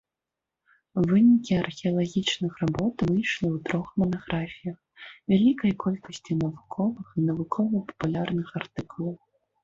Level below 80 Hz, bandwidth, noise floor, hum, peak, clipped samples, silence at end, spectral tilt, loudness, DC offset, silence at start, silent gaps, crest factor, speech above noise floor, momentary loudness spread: -56 dBFS; 7.6 kHz; -88 dBFS; none; -10 dBFS; under 0.1%; 0.45 s; -6.5 dB/octave; -26 LUFS; under 0.1%; 0.95 s; none; 16 dB; 62 dB; 13 LU